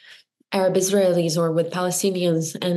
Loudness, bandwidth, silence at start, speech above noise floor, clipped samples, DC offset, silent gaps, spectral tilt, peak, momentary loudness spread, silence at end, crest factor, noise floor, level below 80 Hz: -21 LUFS; 13.5 kHz; 0.1 s; 30 dB; under 0.1%; under 0.1%; none; -5 dB/octave; -6 dBFS; 4 LU; 0 s; 14 dB; -50 dBFS; -76 dBFS